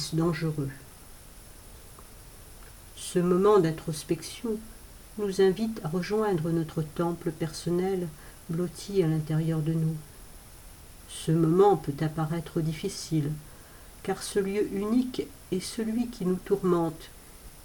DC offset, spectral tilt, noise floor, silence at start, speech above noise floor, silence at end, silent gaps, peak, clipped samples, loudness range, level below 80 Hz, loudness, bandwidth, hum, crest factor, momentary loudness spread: under 0.1%; -6.5 dB/octave; -48 dBFS; 0 s; 21 dB; 0 s; none; -10 dBFS; under 0.1%; 4 LU; -52 dBFS; -28 LUFS; 19 kHz; none; 18 dB; 24 LU